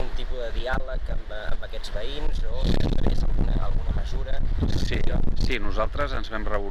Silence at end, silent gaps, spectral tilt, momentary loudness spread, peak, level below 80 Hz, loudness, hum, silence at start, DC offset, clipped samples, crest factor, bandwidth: 0 s; none; -6.5 dB/octave; 8 LU; -10 dBFS; -24 dBFS; -29 LUFS; none; 0 s; under 0.1%; under 0.1%; 12 dB; 7 kHz